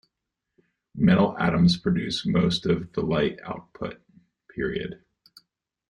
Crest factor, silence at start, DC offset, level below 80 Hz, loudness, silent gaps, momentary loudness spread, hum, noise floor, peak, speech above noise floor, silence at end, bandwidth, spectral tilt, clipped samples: 18 dB; 0.95 s; under 0.1%; -52 dBFS; -24 LUFS; none; 16 LU; none; -84 dBFS; -8 dBFS; 60 dB; 0.95 s; 10 kHz; -7 dB/octave; under 0.1%